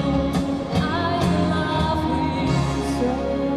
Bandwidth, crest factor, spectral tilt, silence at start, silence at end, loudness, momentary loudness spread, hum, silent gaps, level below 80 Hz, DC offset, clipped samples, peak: 13 kHz; 14 dB; -6.5 dB/octave; 0 s; 0 s; -22 LUFS; 3 LU; none; none; -34 dBFS; under 0.1%; under 0.1%; -8 dBFS